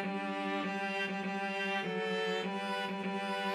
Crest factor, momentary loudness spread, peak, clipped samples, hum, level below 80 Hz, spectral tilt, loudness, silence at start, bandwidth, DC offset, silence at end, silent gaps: 12 dB; 2 LU; -22 dBFS; under 0.1%; none; under -90 dBFS; -5 dB/octave; -35 LUFS; 0 s; 13.5 kHz; under 0.1%; 0 s; none